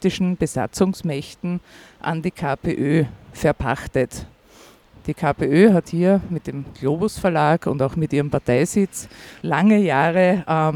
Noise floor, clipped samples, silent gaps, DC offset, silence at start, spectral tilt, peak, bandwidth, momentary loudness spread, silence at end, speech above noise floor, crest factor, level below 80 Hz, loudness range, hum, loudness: -49 dBFS; under 0.1%; none; under 0.1%; 0 s; -6.5 dB/octave; -2 dBFS; 16.5 kHz; 12 LU; 0 s; 29 dB; 18 dB; -44 dBFS; 5 LU; none; -20 LUFS